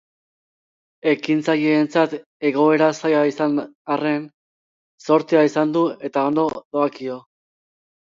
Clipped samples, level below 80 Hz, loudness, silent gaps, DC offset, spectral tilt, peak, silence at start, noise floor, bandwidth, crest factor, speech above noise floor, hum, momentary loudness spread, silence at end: under 0.1%; -70 dBFS; -20 LUFS; 2.26-2.40 s, 3.75-3.85 s, 4.34-4.98 s, 6.65-6.71 s; under 0.1%; -6 dB/octave; -4 dBFS; 1.05 s; under -90 dBFS; 7.6 kHz; 18 dB; over 71 dB; none; 9 LU; 1 s